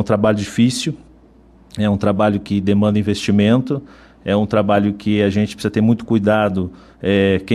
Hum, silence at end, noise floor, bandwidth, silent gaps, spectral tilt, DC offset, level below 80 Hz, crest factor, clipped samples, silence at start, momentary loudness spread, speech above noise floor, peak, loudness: none; 0 s; -47 dBFS; 12.5 kHz; none; -6.5 dB/octave; under 0.1%; -48 dBFS; 14 dB; under 0.1%; 0 s; 9 LU; 31 dB; -4 dBFS; -17 LUFS